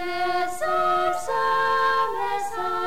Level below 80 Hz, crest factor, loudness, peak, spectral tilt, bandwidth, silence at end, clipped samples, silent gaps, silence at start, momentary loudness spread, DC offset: -58 dBFS; 10 dB; -23 LUFS; -12 dBFS; -3 dB/octave; 16.5 kHz; 0 s; under 0.1%; none; 0 s; 6 LU; 2%